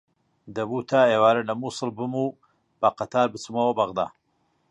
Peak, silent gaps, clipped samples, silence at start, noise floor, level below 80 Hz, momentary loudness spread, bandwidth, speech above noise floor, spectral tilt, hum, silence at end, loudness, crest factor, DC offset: -6 dBFS; none; under 0.1%; 0.45 s; -69 dBFS; -66 dBFS; 11 LU; 11 kHz; 46 dB; -5.5 dB/octave; none; 0.65 s; -24 LUFS; 18 dB; under 0.1%